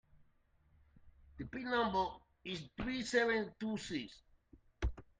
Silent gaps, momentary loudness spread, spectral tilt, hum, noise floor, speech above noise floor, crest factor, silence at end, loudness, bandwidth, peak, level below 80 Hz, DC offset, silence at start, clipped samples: none; 14 LU; -5 dB/octave; none; -72 dBFS; 34 dB; 20 dB; 0.15 s; -38 LUFS; 9.6 kHz; -20 dBFS; -52 dBFS; under 0.1%; 0.15 s; under 0.1%